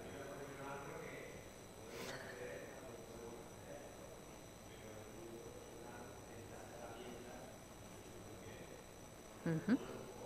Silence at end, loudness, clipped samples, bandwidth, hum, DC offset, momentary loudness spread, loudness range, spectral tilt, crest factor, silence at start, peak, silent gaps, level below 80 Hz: 0 s; -50 LUFS; under 0.1%; 15.5 kHz; none; under 0.1%; 12 LU; 7 LU; -5 dB/octave; 24 dB; 0 s; -26 dBFS; none; -68 dBFS